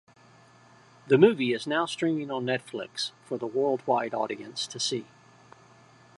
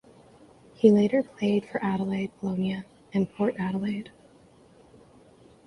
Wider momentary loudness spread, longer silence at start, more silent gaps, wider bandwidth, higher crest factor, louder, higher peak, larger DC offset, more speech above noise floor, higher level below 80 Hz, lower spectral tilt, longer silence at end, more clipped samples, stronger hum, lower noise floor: about the same, 13 LU vs 12 LU; first, 1.05 s vs 0.85 s; neither; about the same, 11.5 kHz vs 10.5 kHz; about the same, 24 dB vs 22 dB; about the same, -27 LUFS vs -27 LUFS; about the same, -4 dBFS vs -6 dBFS; neither; about the same, 29 dB vs 31 dB; second, -78 dBFS vs -64 dBFS; second, -4.5 dB/octave vs -8 dB/octave; second, 1.15 s vs 1.6 s; neither; neither; about the same, -56 dBFS vs -56 dBFS